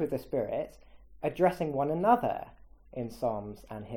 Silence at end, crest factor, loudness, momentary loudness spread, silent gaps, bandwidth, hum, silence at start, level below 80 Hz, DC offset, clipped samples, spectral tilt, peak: 0 s; 22 dB; -31 LUFS; 17 LU; none; 17.5 kHz; none; 0 s; -56 dBFS; under 0.1%; under 0.1%; -7.5 dB/octave; -10 dBFS